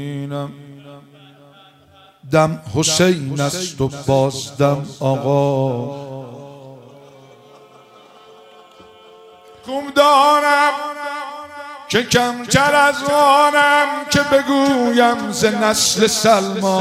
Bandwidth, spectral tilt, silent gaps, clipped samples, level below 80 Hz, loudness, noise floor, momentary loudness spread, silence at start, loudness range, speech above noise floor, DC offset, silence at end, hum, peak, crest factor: 16 kHz; -4 dB/octave; none; under 0.1%; -52 dBFS; -15 LUFS; -49 dBFS; 16 LU; 0 s; 9 LU; 33 dB; under 0.1%; 0 s; none; 0 dBFS; 18 dB